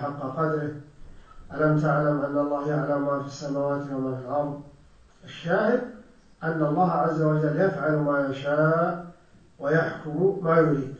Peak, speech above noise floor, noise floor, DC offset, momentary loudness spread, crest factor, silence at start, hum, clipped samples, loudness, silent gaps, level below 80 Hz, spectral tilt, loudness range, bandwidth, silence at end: -6 dBFS; 30 dB; -54 dBFS; under 0.1%; 12 LU; 20 dB; 0 s; none; under 0.1%; -25 LUFS; none; -56 dBFS; -8.5 dB/octave; 4 LU; 7.4 kHz; 0 s